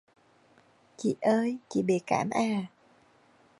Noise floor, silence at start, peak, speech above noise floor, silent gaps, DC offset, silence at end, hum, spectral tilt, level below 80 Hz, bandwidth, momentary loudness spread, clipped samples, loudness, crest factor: -62 dBFS; 1 s; -12 dBFS; 34 dB; none; under 0.1%; 0.95 s; none; -6 dB/octave; -72 dBFS; 11.5 kHz; 7 LU; under 0.1%; -29 LUFS; 20 dB